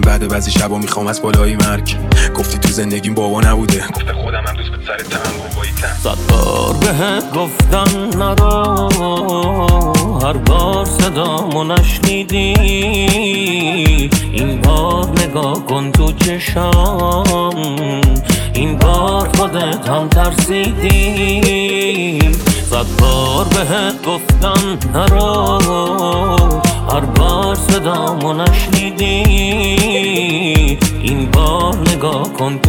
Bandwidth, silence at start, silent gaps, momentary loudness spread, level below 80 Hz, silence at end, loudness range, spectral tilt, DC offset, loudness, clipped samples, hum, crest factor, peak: 18.5 kHz; 0 s; none; 5 LU; -18 dBFS; 0 s; 2 LU; -5 dB/octave; under 0.1%; -13 LUFS; under 0.1%; none; 12 dB; 0 dBFS